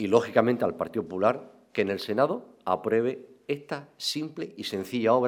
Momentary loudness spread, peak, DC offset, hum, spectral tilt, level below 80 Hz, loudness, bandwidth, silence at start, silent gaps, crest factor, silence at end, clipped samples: 11 LU; -6 dBFS; under 0.1%; none; -5.5 dB/octave; -72 dBFS; -28 LUFS; 16.5 kHz; 0 s; none; 22 dB; 0 s; under 0.1%